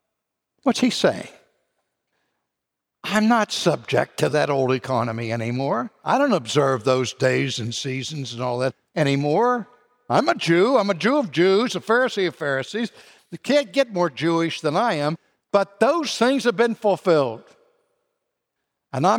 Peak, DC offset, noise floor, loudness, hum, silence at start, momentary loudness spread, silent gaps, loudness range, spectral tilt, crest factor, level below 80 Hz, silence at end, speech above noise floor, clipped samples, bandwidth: -4 dBFS; under 0.1%; -83 dBFS; -21 LUFS; none; 0.65 s; 8 LU; none; 3 LU; -5 dB/octave; 18 dB; -70 dBFS; 0 s; 62 dB; under 0.1%; 16.5 kHz